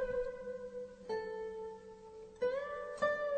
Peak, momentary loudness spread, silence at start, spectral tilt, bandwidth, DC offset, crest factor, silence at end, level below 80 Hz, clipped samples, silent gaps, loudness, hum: -22 dBFS; 16 LU; 0 s; -4.5 dB/octave; 8.8 kHz; under 0.1%; 18 dB; 0 s; -62 dBFS; under 0.1%; none; -41 LUFS; none